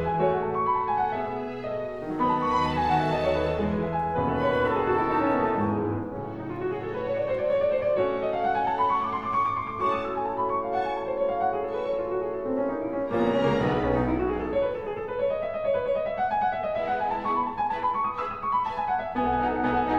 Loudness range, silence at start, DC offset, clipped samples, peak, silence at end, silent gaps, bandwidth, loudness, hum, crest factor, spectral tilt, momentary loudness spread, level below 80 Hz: 2 LU; 0 s; under 0.1%; under 0.1%; -12 dBFS; 0 s; none; 8.4 kHz; -27 LUFS; none; 14 dB; -7.5 dB/octave; 6 LU; -46 dBFS